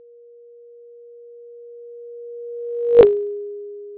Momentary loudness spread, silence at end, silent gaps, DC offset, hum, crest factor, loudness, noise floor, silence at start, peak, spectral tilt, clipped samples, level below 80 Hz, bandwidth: 27 LU; 0 s; none; under 0.1%; none; 22 dB; -17 LUFS; -46 dBFS; 1.25 s; 0 dBFS; -10 dB/octave; under 0.1%; -52 dBFS; 4 kHz